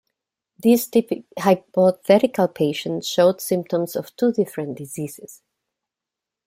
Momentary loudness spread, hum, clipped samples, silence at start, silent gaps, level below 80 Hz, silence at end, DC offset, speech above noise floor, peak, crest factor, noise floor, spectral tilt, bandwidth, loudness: 13 LU; none; under 0.1%; 0.65 s; none; -66 dBFS; 1.1 s; under 0.1%; 67 dB; -2 dBFS; 20 dB; -87 dBFS; -5.5 dB/octave; 16.5 kHz; -20 LUFS